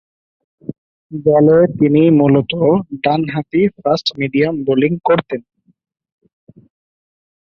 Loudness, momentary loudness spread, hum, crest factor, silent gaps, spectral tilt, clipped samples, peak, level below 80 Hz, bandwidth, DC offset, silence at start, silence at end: -14 LUFS; 17 LU; none; 14 dB; 0.78-1.10 s; -8 dB/octave; under 0.1%; -2 dBFS; -54 dBFS; 6.8 kHz; under 0.1%; 0.7 s; 2.1 s